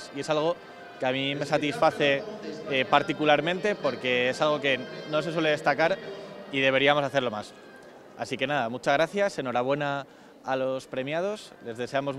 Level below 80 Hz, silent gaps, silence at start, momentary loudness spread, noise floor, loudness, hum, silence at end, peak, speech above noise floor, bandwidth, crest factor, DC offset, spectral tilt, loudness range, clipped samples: -68 dBFS; none; 0 s; 14 LU; -48 dBFS; -26 LUFS; none; 0 s; -4 dBFS; 21 dB; 12.5 kHz; 22 dB; under 0.1%; -5 dB/octave; 4 LU; under 0.1%